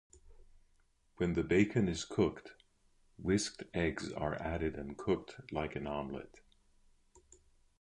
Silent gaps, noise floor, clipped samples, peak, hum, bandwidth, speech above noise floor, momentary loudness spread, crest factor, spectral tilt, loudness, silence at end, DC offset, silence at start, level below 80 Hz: none; -71 dBFS; under 0.1%; -14 dBFS; none; 11 kHz; 36 dB; 12 LU; 22 dB; -5.5 dB/octave; -36 LUFS; 1.4 s; under 0.1%; 0.15 s; -54 dBFS